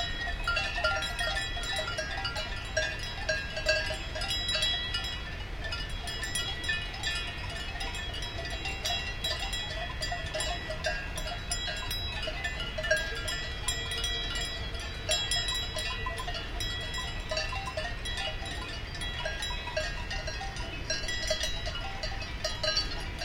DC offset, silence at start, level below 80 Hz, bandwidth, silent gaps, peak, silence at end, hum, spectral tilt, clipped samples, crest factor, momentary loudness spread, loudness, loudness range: under 0.1%; 0 s; -40 dBFS; 17 kHz; none; -12 dBFS; 0 s; none; -2.5 dB/octave; under 0.1%; 20 dB; 7 LU; -32 LUFS; 3 LU